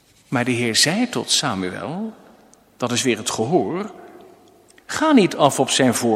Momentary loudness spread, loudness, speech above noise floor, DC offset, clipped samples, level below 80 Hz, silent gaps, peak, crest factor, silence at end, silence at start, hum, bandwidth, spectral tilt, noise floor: 13 LU; -19 LUFS; 32 dB; under 0.1%; under 0.1%; -64 dBFS; none; 0 dBFS; 20 dB; 0 s; 0.3 s; none; 16 kHz; -3.5 dB/octave; -51 dBFS